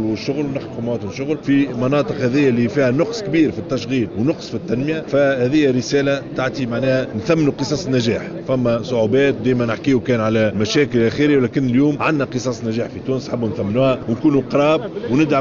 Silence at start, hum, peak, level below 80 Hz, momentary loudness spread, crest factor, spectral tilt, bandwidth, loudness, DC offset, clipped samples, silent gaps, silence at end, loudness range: 0 s; none; -4 dBFS; -48 dBFS; 7 LU; 14 dB; -6 dB/octave; 7.4 kHz; -18 LUFS; under 0.1%; under 0.1%; none; 0 s; 2 LU